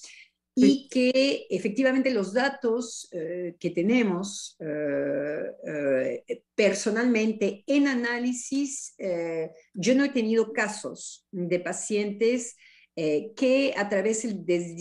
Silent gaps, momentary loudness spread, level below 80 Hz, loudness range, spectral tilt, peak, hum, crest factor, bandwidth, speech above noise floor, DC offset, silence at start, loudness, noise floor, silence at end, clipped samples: none; 11 LU; -76 dBFS; 3 LU; -4.5 dB/octave; -8 dBFS; none; 18 dB; 11.5 kHz; 27 dB; under 0.1%; 0 s; -26 LUFS; -53 dBFS; 0 s; under 0.1%